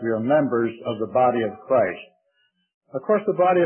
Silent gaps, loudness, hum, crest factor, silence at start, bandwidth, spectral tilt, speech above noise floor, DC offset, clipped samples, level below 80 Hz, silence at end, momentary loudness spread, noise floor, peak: 2.74-2.81 s; -22 LUFS; none; 14 dB; 0 s; 3.3 kHz; -11.5 dB/octave; 48 dB; under 0.1%; under 0.1%; -68 dBFS; 0 s; 10 LU; -69 dBFS; -8 dBFS